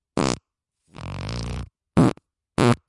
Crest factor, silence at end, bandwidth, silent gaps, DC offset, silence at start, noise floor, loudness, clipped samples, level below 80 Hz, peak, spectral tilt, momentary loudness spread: 24 dB; 0.15 s; 11.5 kHz; none; under 0.1%; 0.15 s; -75 dBFS; -24 LUFS; under 0.1%; -42 dBFS; 0 dBFS; -6 dB/octave; 16 LU